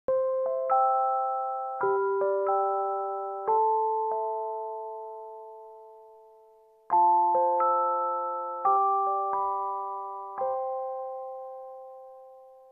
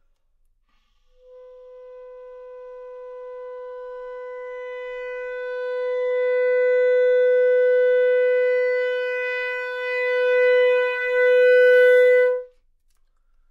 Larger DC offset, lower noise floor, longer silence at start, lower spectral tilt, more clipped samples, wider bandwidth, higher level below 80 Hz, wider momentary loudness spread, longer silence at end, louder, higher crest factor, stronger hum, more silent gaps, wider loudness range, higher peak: neither; second, -58 dBFS vs -63 dBFS; second, 0.1 s vs 1.35 s; first, -8.5 dB/octave vs -0.5 dB/octave; neither; second, 2.6 kHz vs 5.2 kHz; second, -78 dBFS vs -64 dBFS; second, 18 LU vs 22 LU; second, 0.15 s vs 1.05 s; second, -27 LUFS vs -19 LUFS; about the same, 14 dB vs 14 dB; neither; neither; second, 7 LU vs 20 LU; second, -14 dBFS vs -8 dBFS